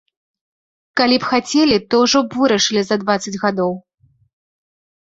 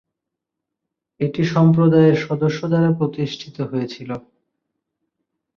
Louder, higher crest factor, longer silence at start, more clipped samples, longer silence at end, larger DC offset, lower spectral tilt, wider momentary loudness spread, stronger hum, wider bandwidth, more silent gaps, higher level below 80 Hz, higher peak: about the same, -16 LUFS vs -18 LUFS; about the same, 16 dB vs 18 dB; second, 0.95 s vs 1.2 s; neither; second, 1.25 s vs 1.4 s; neither; second, -3.5 dB/octave vs -8 dB/octave; second, 7 LU vs 15 LU; neither; first, 8 kHz vs 6.8 kHz; neither; about the same, -56 dBFS vs -58 dBFS; about the same, -2 dBFS vs -2 dBFS